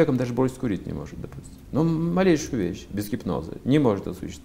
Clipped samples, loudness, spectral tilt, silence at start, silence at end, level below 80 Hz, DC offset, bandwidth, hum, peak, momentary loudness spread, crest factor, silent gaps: under 0.1%; -25 LUFS; -7 dB/octave; 0 s; 0.05 s; -46 dBFS; under 0.1%; 16 kHz; none; -6 dBFS; 14 LU; 18 dB; none